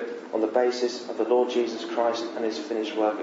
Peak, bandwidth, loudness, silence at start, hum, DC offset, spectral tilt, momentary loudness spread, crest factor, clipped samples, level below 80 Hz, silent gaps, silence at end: -10 dBFS; 8 kHz; -26 LUFS; 0 s; none; under 0.1%; -3.5 dB/octave; 7 LU; 16 dB; under 0.1%; -88 dBFS; none; 0 s